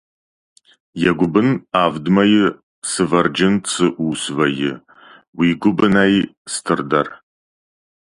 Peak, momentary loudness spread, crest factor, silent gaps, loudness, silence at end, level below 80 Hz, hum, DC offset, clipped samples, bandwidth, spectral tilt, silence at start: 0 dBFS; 10 LU; 18 dB; 2.63-2.82 s, 5.28-5.33 s, 6.37-6.45 s; -17 LUFS; 0.85 s; -52 dBFS; none; under 0.1%; under 0.1%; 11.5 kHz; -5 dB/octave; 0.95 s